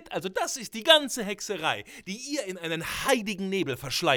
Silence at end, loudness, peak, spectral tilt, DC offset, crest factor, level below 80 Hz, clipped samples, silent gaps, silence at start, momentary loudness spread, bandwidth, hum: 0 s; -27 LUFS; -4 dBFS; -2.5 dB/octave; under 0.1%; 24 dB; -60 dBFS; under 0.1%; none; 0 s; 12 LU; over 20 kHz; none